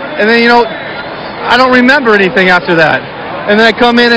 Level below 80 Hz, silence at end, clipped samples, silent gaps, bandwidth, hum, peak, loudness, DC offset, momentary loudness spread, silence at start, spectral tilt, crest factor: -42 dBFS; 0 s; 2%; none; 8 kHz; none; 0 dBFS; -7 LUFS; under 0.1%; 14 LU; 0 s; -5.5 dB/octave; 8 dB